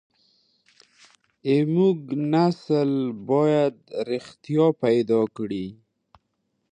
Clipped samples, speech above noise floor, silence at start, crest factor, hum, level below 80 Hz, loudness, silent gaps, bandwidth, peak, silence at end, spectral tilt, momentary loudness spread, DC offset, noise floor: under 0.1%; 52 dB; 1.45 s; 16 dB; none; -68 dBFS; -23 LUFS; none; 9.6 kHz; -8 dBFS; 1 s; -8.5 dB/octave; 11 LU; under 0.1%; -75 dBFS